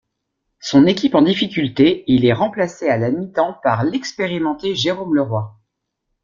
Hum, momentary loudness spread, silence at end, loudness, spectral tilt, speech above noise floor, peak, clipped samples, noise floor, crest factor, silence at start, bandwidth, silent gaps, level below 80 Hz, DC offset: none; 8 LU; 0.75 s; -17 LUFS; -6 dB/octave; 58 dB; -2 dBFS; under 0.1%; -75 dBFS; 16 dB; 0.65 s; 7.4 kHz; none; -54 dBFS; under 0.1%